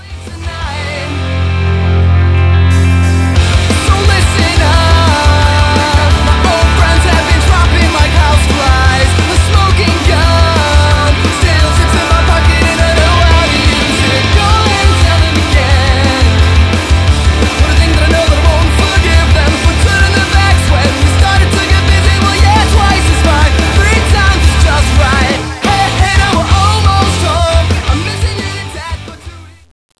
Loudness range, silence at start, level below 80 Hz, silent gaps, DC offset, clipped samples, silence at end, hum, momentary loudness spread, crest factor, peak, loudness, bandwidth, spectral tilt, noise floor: 2 LU; 0 s; -12 dBFS; none; 0.4%; 0.7%; 0.5 s; none; 5 LU; 8 dB; 0 dBFS; -9 LUFS; 11 kHz; -5 dB/octave; -30 dBFS